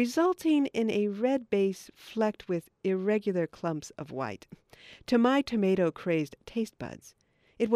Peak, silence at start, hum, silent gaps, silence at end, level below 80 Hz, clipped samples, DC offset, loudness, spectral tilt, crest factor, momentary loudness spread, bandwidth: -12 dBFS; 0 s; none; none; 0 s; -66 dBFS; under 0.1%; under 0.1%; -29 LUFS; -6.5 dB/octave; 18 dB; 14 LU; 15 kHz